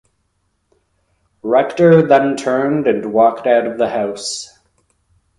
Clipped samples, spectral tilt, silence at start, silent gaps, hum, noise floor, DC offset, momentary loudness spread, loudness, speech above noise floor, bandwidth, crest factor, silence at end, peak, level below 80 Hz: under 0.1%; -5.5 dB/octave; 1.45 s; none; none; -66 dBFS; under 0.1%; 13 LU; -14 LUFS; 52 dB; 11.5 kHz; 16 dB; 0.95 s; 0 dBFS; -58 dBFS